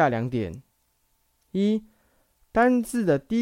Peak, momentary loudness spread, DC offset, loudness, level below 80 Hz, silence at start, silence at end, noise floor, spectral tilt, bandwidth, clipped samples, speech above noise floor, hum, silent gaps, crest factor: -8 dBFS; 12 LU; under 0.1%; -25 LUFS; -54 dBFS; 0 s; 0 s; -69 dBFS; -7 dB/octave; 15.5 kHz; under 0.1%; 46 dB; none; none; 18 dB